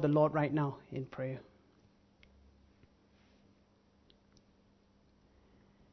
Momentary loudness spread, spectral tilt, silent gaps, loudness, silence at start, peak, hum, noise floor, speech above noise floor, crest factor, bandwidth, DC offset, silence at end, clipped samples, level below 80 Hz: 14 LU; -8 dB/octave; none; -35 LUFS; 0 s; -16 dBFS; none; -68 dBFS; 35 dB; 24 dB; 6.2 kHz; under 0.1%; 4.5 s; under 0.1%; -70 dBFS